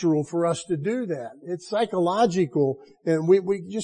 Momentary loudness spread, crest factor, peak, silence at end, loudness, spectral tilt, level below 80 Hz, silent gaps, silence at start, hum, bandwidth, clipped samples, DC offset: 11 LU; 16 dB; -8 dBFS; 0 s; -24 LUFS; -6.5 dB/octave; -68 dBFS; none; 0 s; none; 10 kHz; under 0.1%; under 0.1%